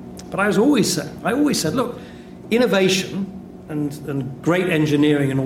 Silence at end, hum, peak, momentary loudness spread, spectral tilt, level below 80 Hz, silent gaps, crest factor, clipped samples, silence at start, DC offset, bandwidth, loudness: 0 s; none; -6 dBFS; 14 LU; -5 dB/octave; -52 dBFS; none; 14 dB; under 0.1%; 0 s; under 0.1%; 16 kHz; -20 LUFS